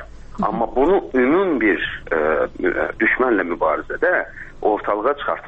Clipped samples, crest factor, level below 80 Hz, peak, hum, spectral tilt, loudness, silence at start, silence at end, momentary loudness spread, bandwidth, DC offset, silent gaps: under 0.1%; 14 dB; -40 dBFS; -4 dBFS; none; -7.5 dB/octave; -19 LUFS; 0 s; 0 s; 6 LU; 5.4 kHz; under 0.1%; none